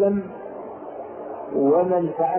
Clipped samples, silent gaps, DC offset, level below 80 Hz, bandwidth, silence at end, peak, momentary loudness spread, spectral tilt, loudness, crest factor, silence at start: under 0.1%; none; under 0.1%; -62 dBFS; 3.2 kHz; 0 s; -8 dBFS; 17 LU; -13 dB/octave; -21 LUFS; 14 dB; 0 s